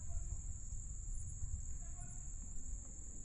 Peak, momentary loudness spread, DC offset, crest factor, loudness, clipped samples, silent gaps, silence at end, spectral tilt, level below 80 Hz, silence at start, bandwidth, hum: -30 dBFS; 3 LU; under 0.1%; 14 dB; -49 LUFS; under 0.1%; none; 0 s; -5 dB/octave; -46 dBFS; 0 s; 11 kHz; none